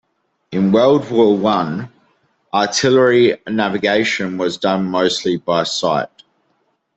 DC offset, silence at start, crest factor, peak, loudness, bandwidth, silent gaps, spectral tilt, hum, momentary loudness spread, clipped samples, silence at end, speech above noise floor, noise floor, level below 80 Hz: under 0.1%; 0.5 s; 14 dB; -2 dBFS; -16 LUFS; 8.2 kHz; none; -4.5 dB/octave; none; 9 LU; under 0.1%; 0.9 s; 49 dB; -65 dBFS; -58 dBFS